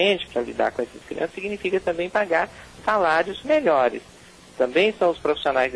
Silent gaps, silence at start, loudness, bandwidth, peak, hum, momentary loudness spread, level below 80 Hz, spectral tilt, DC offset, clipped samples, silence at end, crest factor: none; 0 s; -23 LUFS; 11 kHz; -8 dBFS; none; 10 LU; -54 dBFS; -4.5 dB/octave; under 0.1%; under 0.1%; 0 s; 16 dB